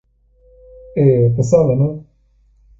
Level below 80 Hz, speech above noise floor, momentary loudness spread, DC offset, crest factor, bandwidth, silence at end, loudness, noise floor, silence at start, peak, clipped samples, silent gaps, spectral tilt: -44 dBFS; 41 dB; 11 LU; under 0.1%; 16 dB; 7.8 kHz; 0.8 s; -15 LUFS; -55 dBFS; 0.95 s; 0 dBFS; under 0.1%; none; -9.5 dB/octave